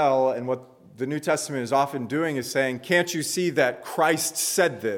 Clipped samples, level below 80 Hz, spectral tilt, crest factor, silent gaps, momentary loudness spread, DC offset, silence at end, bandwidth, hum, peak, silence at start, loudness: under 0.1%; -74 dBFS; -3.5 dB/octave; 16 dB; none; 7 LU; under 0.1%; 0 s; 19 kHz; none; -8 dBFS; 0 s; -24 LUFS